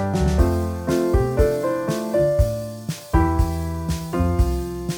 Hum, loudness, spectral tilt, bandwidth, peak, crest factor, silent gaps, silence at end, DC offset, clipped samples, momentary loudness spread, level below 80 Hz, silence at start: none; -22 LUFS; -7 dB/octave; over 20 kHz; -4 dBFS; 16 dB; none; 0 s; under 0.1%; under 0.1%; 7 LU; -26 dBFS; 0 s